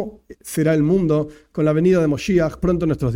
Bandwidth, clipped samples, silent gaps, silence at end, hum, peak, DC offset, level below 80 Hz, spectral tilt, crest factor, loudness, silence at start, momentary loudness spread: 16.5 kHz; under 0.1%; none; 0 s; none; -6 dBFS; under 0.1%; -40 dBFS; -7.5 dB/octave; 12 dB; -19 LUFS; 0 s; 12 LU